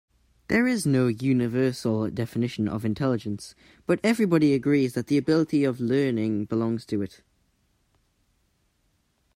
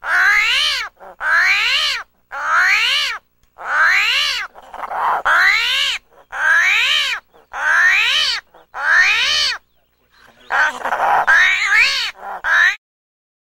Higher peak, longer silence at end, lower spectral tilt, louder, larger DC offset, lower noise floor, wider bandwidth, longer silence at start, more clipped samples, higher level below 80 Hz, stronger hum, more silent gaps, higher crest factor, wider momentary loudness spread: second, -8 dBFS vs -2 dBFS; first, 2.3 s vs 0.8 s; first, -7 dB/octave vs 2 dB/octave; second, -25 LUFS vs -14 LUFS; neither; first, -70 dBFS vs -60 dBFS; about the same, 16 kHz vs 16 kHz; first, 0.5 s vs 0.05 s; neither; second, -60 dBFS vs -50 dBFS; neither; neither; about the same, 18 dB vs 16 dB; second, 9 LU vs 14 LU